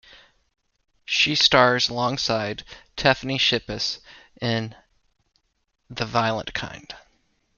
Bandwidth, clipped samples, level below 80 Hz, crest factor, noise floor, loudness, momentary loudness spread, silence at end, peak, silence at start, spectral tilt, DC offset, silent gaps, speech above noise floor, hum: 7.2 kHz; under 0.1%; -52 dBFS; 24 dB; -66 dBFS; -22 LUFS; 20 LU; 0.6 s; -2 dBFS; 1.1 s; -3.5 dB/octave; under 0.1%; none; 43 dB; none